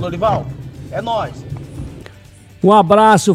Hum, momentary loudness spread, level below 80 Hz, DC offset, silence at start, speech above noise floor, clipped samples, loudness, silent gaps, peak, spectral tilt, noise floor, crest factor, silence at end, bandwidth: none; 21 LU; -40 dBFS; under 0.1%; 0 s; 28 dB; under 0.1%; -14 LUFS; none; 0 dBFS; -5.5 dB/octave; -41 dBFS; 16 dB; 0 s; 14.5 kHz